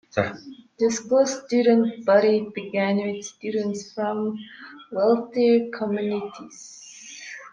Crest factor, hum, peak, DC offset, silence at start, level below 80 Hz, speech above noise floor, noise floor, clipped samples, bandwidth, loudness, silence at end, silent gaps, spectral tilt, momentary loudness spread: 18 dB; none; -6 dBFS; under 0.1%; 0.15 s; -70 dBFS; 19 dB; -41 dBFS; under 0.1%; 9.6 kHz; -23 LUFS; 0.05 s; none; -5 dB/octave; 21 LU